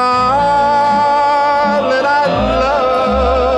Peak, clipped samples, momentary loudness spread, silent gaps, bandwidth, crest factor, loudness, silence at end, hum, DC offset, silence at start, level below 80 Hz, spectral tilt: -2 dBFS; under 0.1%; 2 LU; none; 10 kHz; 10 dB; -12 LUFS; 0 s; none; under 0.1%; 0 s; -28 dBFS; -5.5 dB/octave